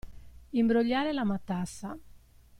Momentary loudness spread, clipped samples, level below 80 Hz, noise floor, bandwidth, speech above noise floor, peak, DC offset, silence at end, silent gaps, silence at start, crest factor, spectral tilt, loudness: 16 LU; under 0.1%; -54 dBFS; -55 dBFS; 12.5 kHz; 26 dB; -14 dBFS; under 0.1%; 0.05 s; none; 0.05 s; 16 dB; -6 dB/octave; -29 LUFS